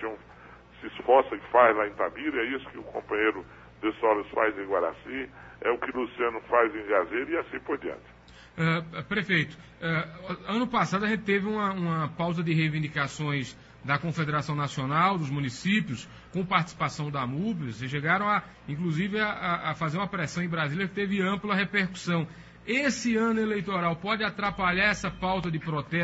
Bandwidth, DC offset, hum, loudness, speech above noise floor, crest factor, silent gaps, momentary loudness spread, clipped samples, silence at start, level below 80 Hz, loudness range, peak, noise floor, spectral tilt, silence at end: 8 kHz; under 0.1%; none; -28 LUFS; 23 dB; 22 dB; none; 11 LU; under 0.1%; 0 s; -56 dBFS; 2 LU; -8 dBFS; -50 dBFS; -6 dB/octave; 0 s